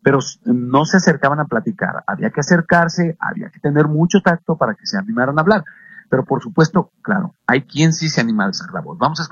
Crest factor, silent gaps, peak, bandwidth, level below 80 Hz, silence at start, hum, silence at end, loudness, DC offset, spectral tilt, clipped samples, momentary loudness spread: 16 dB; none; 0 dBFS; 7.4 kHz; -54 dBFS; 0.05 s; none; 0.05 s; -17 LUFS; under 0.1%; -5.5 dB/octave; under 0.1%; 7 LU